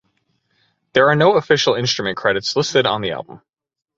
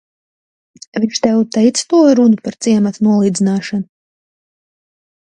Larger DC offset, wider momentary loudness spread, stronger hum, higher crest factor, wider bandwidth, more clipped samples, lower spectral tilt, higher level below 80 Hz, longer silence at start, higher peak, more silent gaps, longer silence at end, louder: neither; about the same, 11 LU vs 12 LU; neither; about the same, 18 dB vs 14 dB; second, 8 kHz vs 10 kHz; neither; second, -4 dB/octave vs -5.5 dB/octave; about the same, -56 dBFS vs -60 dBFS; about the same, 0.95 s vs 0.95 s; about the same, 0 dBFS vs 0 dBFS; neither; second, 0.6 s vs 1.35 s; second, -17 LUFS vs -13 LUFS